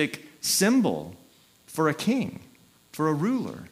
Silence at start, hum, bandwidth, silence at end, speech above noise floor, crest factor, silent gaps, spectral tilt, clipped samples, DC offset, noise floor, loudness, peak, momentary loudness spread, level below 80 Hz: 0 s; none; 16 kHz; 0.05 s; 29 dB; 18 dB; none; -4 dB/octave; under 0.1%; under 0.1%; -55 dBFS; -26 LUFS; -10 dBFS; 17 LU; -68 dBFS